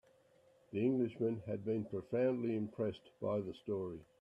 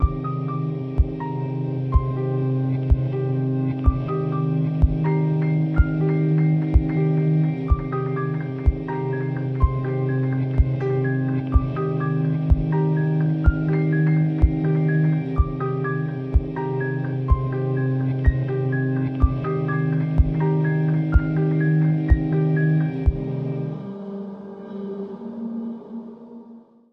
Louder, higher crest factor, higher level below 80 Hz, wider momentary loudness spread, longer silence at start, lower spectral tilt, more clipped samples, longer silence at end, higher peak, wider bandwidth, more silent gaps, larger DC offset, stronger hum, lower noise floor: second, -39 LUFS vs -22 LUFS; about the same, 16 dB vs 16 dB; second, -76 dBFS vs -28 dBFS; second, 7 LU vs 10 LU; first, 0.7 s vs 0 s; second, -9.5 dB/octave vs -11.5 dB/octave; neither; about the same, 0.2 s vs 0.3 s; second, -24 dBFS vs -4 dBFS; first, 7.8 kHz vs 4.2 kHz; neither; neither; neither; first, -69 dBFS vs -46 dBFS